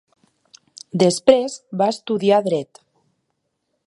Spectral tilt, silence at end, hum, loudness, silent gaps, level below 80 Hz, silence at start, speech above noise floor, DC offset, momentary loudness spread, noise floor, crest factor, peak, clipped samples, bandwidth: -5 dB/octave; 1.2 s; none; -19 LUFS; none; -64 dBFS; 0.95 s; 56 dB; under 0.1%; 12 LU; -74 dBFS; 20 dB; 0 dBFS; under 0.1%; 11.5 kHz